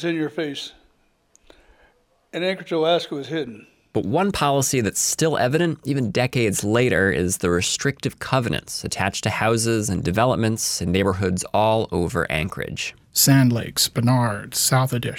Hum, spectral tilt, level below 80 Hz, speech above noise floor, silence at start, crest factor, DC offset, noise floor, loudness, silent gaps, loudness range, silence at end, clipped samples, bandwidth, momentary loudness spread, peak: none; -4.5 dB/octave; -48 dBFS; 41 dB; 0 s; 16 dB; under 0.1%; -62 dBFS; -21 LUFS; none; 6 LU; 0 s; under 0.1%; 17 kHz; 9 LU; -6 dBFS